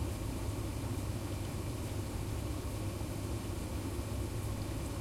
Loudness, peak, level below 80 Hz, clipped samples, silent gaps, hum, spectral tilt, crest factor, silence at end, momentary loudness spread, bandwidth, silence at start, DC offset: -39 LUFS; -26 dBFS; -44 dBFS; under 0.1%; none; none; -6 dB/octave; 12 dB; 0 s; 1 LU; 16.5 kHz; 0 s; under 0.1%